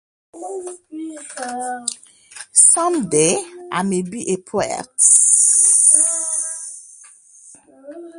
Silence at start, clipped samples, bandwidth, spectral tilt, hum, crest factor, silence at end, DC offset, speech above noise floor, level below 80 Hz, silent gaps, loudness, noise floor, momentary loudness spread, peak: 0.35 s; under 0.1%; 14 kHz; -2 dB/octave; none; 18 dB; 0 s; under 0.1%; 27 dB; -62 dBFS; none; -14 LUFS; -46 dBFS; 22 LU; 0 dBFS